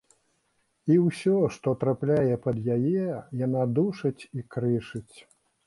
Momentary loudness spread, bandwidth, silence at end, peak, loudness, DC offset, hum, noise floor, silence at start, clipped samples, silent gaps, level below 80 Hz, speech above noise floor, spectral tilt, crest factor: 11 LU; 11.5 kHz; 0.45 s; -10 dBFS; -26 LUFS; under 0.1%; none; -72 dBFS; 0.85 s; under 0.1%; none; -60 dBFS; 46 dB; -8.5 dB/octave; 16 dB